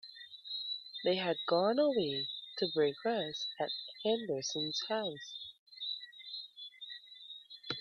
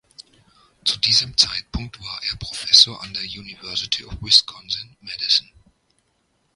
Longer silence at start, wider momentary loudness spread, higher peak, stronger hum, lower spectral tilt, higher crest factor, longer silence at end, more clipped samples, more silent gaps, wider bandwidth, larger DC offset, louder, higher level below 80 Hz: second, 0.05 s vs 0.2 s; about the same, 17 LU vs 18 LU; second, -18 dBFS vs 0 dBFS; neither; first, -4 dB/octave vs -0.5 dB/octave; about the same, 18 dB vs 22 dB; second, 0 s vs 1.15 s; neither; first, 5.59-5.66 s vs none; second, 7.2 kHz vs 16 kHz; neither; second, -36 LUFS vs -18 LUFS; second, -80 dBFS vs -44 dBFS